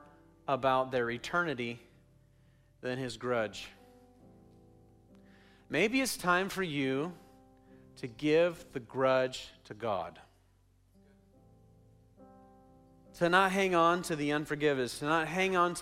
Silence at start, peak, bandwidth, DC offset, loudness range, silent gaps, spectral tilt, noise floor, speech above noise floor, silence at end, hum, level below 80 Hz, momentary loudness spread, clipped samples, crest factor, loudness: 0.5 s; -12 dBFS; 16 kHz; under 0.1%; 10 LU; none; -4.5 dB/octave; -67 dBFS; 35 dB; 0 s; none; -66 dBFS; 16 LU; under 0.1%; 22 dB; -31 LUFS